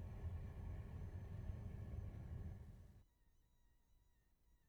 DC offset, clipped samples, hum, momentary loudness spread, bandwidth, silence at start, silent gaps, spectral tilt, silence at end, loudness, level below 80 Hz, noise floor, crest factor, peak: under 0.1%; under 0.1%; none; 8 LU; 14.5 kHz; 0 s; none; -8.5 dB/octave; 0.1 s; -53 LUFS; -56 dBFS; -77 dBFS; 18 dB; -36 dBFS